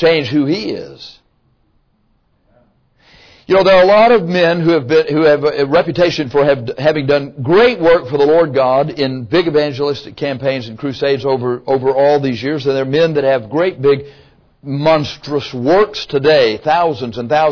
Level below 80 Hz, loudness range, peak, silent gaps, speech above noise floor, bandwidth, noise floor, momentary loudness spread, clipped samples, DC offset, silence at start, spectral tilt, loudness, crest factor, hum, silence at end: -46 dBFS; 5 LU; -2 dBFS; none; 45 dB; 5.4 kHz; -58 dBFS; 9 LU; under 0.1%; under 0.1%; 0 s; -6.5 dB/octave; -13 LUFS; 12 dB; none; 0 s